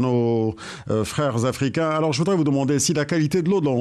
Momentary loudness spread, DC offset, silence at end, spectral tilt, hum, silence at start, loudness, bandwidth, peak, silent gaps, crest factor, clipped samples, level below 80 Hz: 5 LU; under 0.1%; 0 s; -5.5 dB/octave; none; 0 s; -21 LUFS; 13 kHz; -10 dBFS; none; 12 dB; under 0.1%; -54 dBFS